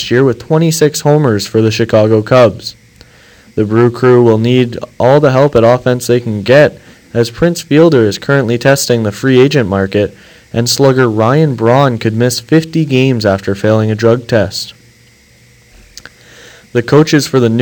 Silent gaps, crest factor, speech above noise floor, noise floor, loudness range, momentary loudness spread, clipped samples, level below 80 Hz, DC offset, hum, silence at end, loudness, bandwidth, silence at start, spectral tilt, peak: none; 10 dB; 35 dB; -45 dBFS; 5 LU; 8 LU; 0.7%; -44 dBFS; under 0.1%; none; 0 s; -10 LUFS; 19 kHz; 0 s; -6 dB/octave; 0 dBFS